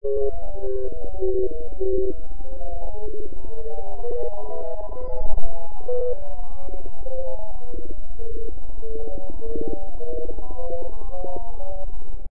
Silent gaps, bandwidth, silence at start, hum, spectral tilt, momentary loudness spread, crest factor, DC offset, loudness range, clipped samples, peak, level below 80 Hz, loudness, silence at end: none; 1.6 kHz; 0 s; none; -14 dB/octave; 12 LU; 18 dB; 20%; 6 LU; under 0.1%; -2 dBFS; -32 dBFS; -32 LUFS; 0.05 s